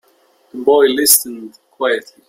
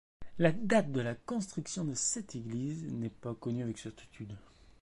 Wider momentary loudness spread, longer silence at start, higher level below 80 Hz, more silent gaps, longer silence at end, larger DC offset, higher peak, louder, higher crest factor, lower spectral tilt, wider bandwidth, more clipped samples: about the same, 20 LU vs 18 LU; first, 0.55 s vs 0.2 s; about the same, -62 dBFS vs -62 dBFS; neither; first, 0.3 s vs 0 s; neither; first, 0 dBFS vs -14 dBFS; first, -13 LUFS vs -35 LUFS; about the same, 16 dB vs 20 dB; second, -0.5 dB/octave vs -5 dB/octave; first, 16.5 kHz vs 11.5 kHz; neither